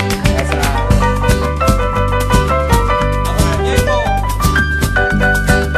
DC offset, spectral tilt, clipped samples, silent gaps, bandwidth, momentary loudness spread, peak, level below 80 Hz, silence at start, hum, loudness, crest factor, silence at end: under 0.1%; -5 dB/octave; under 0.1%; none; 15.5 kHz; 2 LU; 0 dBFS; -18 dBFS; 0 s; none; -14 LUFS; 12 dB; 0 s